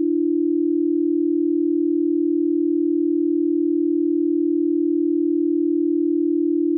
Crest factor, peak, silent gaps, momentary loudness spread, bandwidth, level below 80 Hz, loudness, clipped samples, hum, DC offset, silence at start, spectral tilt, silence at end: 6 dB; -14 dBFS; none; 0 LU; 0.4 kHz; -88 dBFS; -20 LUFS; under 0.1%; none; under 0.1%; 0 s; -15.5 dB/octave; 0 s